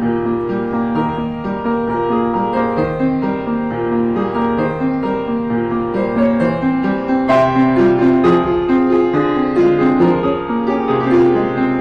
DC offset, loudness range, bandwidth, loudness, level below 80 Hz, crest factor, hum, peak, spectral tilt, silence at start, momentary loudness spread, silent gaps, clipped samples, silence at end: 0.3%; 4 LU; 6.6 kHz; -16 LUFS; -42 dBFS; 10 dB; none; -6 dBFS; -8.5 dB/octave; 0 s; 6 LU; none; under 0.1%; 0 s